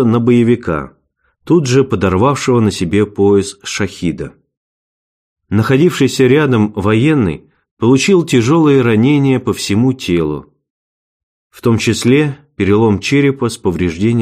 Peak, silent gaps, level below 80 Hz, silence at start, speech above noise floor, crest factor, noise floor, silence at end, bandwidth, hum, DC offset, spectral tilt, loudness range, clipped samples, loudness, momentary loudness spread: 0 dBFS; 4.57-5.36 s, 7.71-7.77 s, 10.70-11.50 s; -44 dBFS; 0 s; 48 dB; 12 dB; -60 dBFS; 0 s; 15.5 kHz; none; under 0.1%; -6 dB/octave; 4 LU; under 0.1%; -13 LUFS; 9 LU